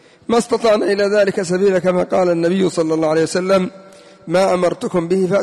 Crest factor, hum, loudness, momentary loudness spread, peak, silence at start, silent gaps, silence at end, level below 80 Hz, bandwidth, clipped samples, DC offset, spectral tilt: 10 dB; none; -16 LUFS; 3 LU; -6 dBFS; 0.3 s; none; 0 s; -54 dBFS; 12 kHz; under 0.1%; under 0.1%; -5.5 dB/octave